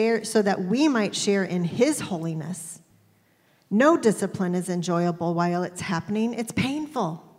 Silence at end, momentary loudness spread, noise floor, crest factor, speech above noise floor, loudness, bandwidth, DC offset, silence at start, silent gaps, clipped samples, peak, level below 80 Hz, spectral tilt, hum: 0.15 s; 9 LU; -62 dBFS; 18 dB; 38 dB; -24 LUFS; 16 kHz; under 0.1%; 0 s; none; under 0.1%; -6 dBFS; -66 dBFS; -5.5 dB/octave; none